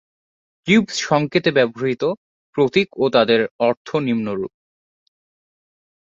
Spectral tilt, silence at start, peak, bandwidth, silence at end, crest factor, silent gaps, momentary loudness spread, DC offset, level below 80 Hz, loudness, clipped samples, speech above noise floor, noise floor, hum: -5 dB/octave; 0.65 s; -2 dBFS; 7.8 kHz; 1.55 s; 18 dB; 2.17-2.53 s, 3.51-3.59 s, 3.77-3.85 s; 11 LU; under 0.1%; -60 dBFS; -19 LUFS; under 0.1%; over 72 dB; under -90 dBFS; none